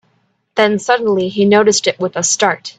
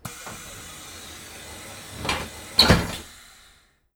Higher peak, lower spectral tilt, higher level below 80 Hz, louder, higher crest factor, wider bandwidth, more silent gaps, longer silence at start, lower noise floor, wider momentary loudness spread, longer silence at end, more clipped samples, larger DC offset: about the same, 0 dBFS vs 0 dBFS; about the same, -3 dB/octave vs -3.5 dB/octave; second, -58 dBFS vs -40 dBFS; first, -14 LUFS vs -21 LUFS; second, 14 dB vs 28 dB; second, 9.4 kHz vs 19.5 kHz; neither; first, 0.55 s vs 0.05 s; about the same, -61 dBFS vs -58 dBFS; second, 6 LU vs 21 LU; second, 0.1 s vs 0.85 s; neither; neither